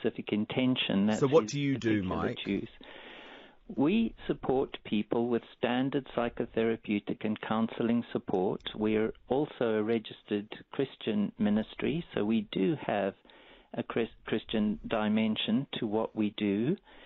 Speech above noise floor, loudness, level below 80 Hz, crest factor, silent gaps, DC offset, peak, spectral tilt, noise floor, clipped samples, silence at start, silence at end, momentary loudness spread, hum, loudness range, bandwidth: 21 dB; -31 LUFS; -60 dBFS; 20 dB; none; under 0.1%; -12 dBFS; -5 dB/octave; -52 dBFS; under 0.1%; 0 s; 0 s; 8 LU; none; 2 LU; 7.4 kHz